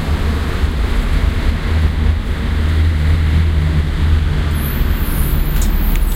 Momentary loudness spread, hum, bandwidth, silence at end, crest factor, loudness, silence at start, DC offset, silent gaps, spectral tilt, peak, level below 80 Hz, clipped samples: 4 LU; none; 16 kHz; 0 s; 12 dB; -17 LUFS; 0 s; under 0.1%; none; -6 dB/octave; -2 dBFS; -16 dBFS; under 0.1%